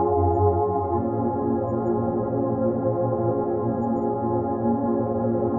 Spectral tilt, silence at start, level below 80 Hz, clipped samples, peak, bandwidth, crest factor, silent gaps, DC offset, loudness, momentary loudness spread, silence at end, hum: -14 dB/octave; 0 s; -52 dBFS; under 0.1%; -8 dBFS; 2.2 kHz; 16 dB; none; under 0.1%; -24 LUFS; 4 LU; 0 s; none